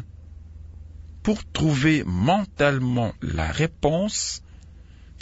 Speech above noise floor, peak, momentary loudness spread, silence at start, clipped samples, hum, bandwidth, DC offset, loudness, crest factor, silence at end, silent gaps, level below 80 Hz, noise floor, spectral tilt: 23 dB; -6 dBFS; 23 LU; 0 s; under 0.1%; none; 8 kHz; under 0.1%; -23 LUFS; 18 dB; 0.05 s; none; -42 dBFS; -45 dBFS; -5 dB/octave